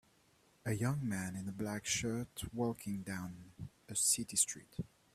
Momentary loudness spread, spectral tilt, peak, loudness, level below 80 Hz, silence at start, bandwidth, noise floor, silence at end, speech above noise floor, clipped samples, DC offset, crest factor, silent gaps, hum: 16 LU; -3.5 dB/octave; -18 dBFS; -37 LUFS; -64 dBFS; 0.65 s; 15.5 kHz; -70 dBFS; 0.3 s; 32 dB; under 0.1%; under 0.1%; 22 dB; none; none